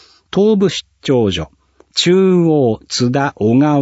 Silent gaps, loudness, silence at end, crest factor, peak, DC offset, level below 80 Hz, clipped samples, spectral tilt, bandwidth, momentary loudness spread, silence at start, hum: none; -14 LUFS; 0 s; 12 dB; -2 dBFS; under 0.1%; -46 dBFS; under 0.1%; -6 dB/octave; 8 kHz; 10 LU; 0.35 s; none